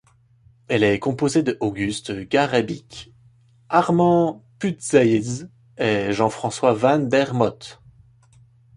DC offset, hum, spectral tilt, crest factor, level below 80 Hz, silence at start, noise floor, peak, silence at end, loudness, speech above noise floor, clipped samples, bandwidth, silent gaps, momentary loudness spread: under 0.1%; none; -5.5 dB/octave; 20 dB; -54 dBFS; 0.7 s; -55 dBFS; -2 dBFS; 1.05 s; -21 LUFS; 35 dB; under 0.1%; 11.5 kHz; none; 13 LU